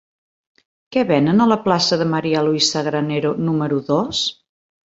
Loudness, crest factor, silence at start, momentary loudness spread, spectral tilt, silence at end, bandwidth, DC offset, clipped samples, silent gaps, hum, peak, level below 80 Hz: -18 LUFS; 16 dB; 0.9 s; 6 LU; -5 dB/octave; 0.55 s; 8 kHz; under 0.1%; under 0.1%; none; none; -2 dBFS; -58 dBFS